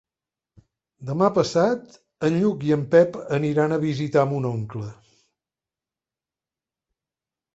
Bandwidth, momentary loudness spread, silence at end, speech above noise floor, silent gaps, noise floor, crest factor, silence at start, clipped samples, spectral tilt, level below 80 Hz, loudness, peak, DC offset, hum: 8 kHz; 13 LU; 2.6 s; over 69 dB; none; under -90 dBFS; 20 dB; 1 s; under 0.1%; -7 dB/octave; -62 dBFS; -22 LUFS; -6 dBFS; under 0.1%; none